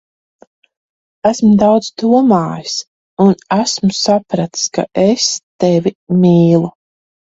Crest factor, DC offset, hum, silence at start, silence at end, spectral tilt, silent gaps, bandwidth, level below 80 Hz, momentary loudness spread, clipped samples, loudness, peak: 14 dB; under 0.1%; none; 1.25 s; 0.7 s; -5.5 dB/octave; 2.87-3.17 s, 5.43-5.59 s, 5.95-6.07 s; 8 kHz; -52 dBFS; 9 LU; under 0.1%; -13 LUFS; 0 dBFS